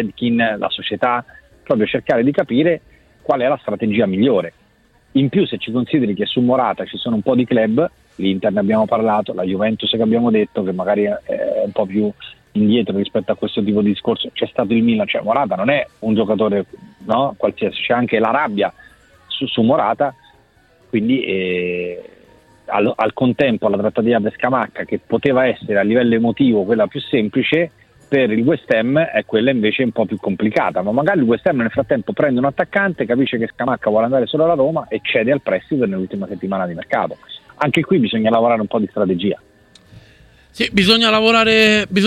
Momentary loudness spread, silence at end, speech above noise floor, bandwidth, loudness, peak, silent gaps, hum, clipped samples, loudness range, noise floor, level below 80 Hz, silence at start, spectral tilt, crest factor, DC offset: 7 LU; 0 s; 38 dB; 11.5 kHz; -17 LUFS; -2 dBFS; none; none; under 0.1%; 3 LU; -54 dBFS; -52 dBFS; 0 s; -6.5 dB/octave; 16 dB; under 0.1%